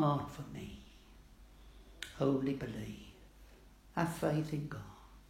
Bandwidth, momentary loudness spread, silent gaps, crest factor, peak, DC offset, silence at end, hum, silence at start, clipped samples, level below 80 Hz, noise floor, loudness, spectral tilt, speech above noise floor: 16 kHz; 25 LU; none; 20 dB; -18 dBFS; under 0.1%; 0.05 s; none; 0 s; under 0.1%; -58 dBFS; -59 dBFS; -38 LUFS; -7 dB/octave; 23 dB